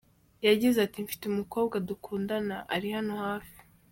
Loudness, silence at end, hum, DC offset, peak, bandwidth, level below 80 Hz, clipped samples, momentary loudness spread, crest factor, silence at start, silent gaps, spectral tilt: -30 LUFS; 0.35 s; none; under 0.1%; -12 dBFS; 17 kHz; -64 dBFS; under 0.1%; 11 LU; 20 dB; 0.4 s; none; -5 dB/octave